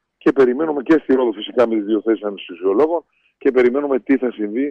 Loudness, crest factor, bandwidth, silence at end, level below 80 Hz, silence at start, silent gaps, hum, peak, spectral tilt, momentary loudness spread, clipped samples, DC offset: -18 LUFS; 12 dB; 6.4 kHz; 0 s; -58 dBFS; 0.25 s; none; none; -4 dBFS; -7 dB/octave; 7 LU; under 0.1%; under 0.1%